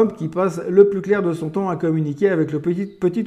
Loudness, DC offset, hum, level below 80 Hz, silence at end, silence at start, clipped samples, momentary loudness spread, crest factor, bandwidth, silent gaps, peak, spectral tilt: -19 LUFS; under 0.1%; none; -60 dBFS; 0 s; 0 s; under 0.1%; 8 LU; 18 dB; 10.5 kHz; none; 0 dBFS; -8.5 dB/octave